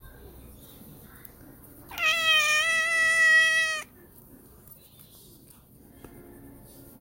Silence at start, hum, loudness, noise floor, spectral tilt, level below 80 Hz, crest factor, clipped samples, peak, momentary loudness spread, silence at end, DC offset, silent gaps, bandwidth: 0.5 s; none; -21 LUFS; -53 dBFS; 0 dB/octave; -58 dBFS; 18 dB; under 0.1%; -12 dBFS; 15 LU; 0.55 s; under 0.1%; none; 16.5 kHz